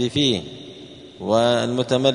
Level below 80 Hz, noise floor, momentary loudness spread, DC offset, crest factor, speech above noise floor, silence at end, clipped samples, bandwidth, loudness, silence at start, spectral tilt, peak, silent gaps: -56 dBFS; -41 dBFS; 21 LU; under 0.1%; 18 dB; 21 dB; 0 s; under 0.1%; 10.5 kHz; -20 LUFS; 0 s; -5 dB/octave; -4 dBFS; none